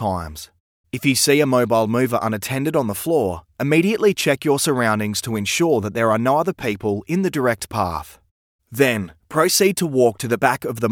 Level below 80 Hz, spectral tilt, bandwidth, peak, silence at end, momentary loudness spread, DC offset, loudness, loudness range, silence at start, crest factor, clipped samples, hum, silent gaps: -52 dBFS; -4.5 dB/octave; 18.5 kHz; 0 dBFS; 0 s; 9 LU; under 0.1%; -19 LUFS; 3 LU; 0 s; 18 dB; under 0.1%; none; 0.60-0.84 s, 8.31-8.59 s